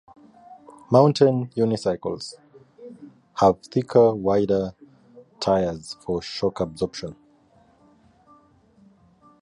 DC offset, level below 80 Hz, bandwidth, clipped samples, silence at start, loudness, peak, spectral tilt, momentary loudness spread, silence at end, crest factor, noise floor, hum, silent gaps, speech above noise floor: under 0.1%; -54 dBFS; 11 kHz; under 0.1%; 0.5 s; -22 LUFS; -4 dBFS; -7 dB/octave; 17 LU; 2.3 s; 20 dB; -58 dBFS; none; none; 36 dB